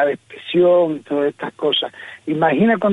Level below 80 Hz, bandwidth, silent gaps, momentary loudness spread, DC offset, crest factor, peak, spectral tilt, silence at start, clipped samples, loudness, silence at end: -64 dBFS; 8.8 kHz; none; 12 LU; under 0.1%; 14 dB; -4 dBFS; -7 dB/octave; 0 s; under 0.1%; -18 LUFS; 0 s